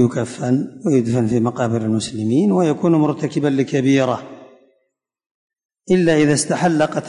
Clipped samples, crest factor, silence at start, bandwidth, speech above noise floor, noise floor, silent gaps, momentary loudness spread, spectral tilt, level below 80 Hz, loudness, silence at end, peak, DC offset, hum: under 0.1%; 14 dB; 0 s; 11 kHz; 54 dB; -71 dBFS; 5.26-5.50 s, 5.65-5.69 s; 5 LU; -6 dB/octave; -56 dBFS; -18 LUFS; 0 s; -4 dBFS; under 0.1%; none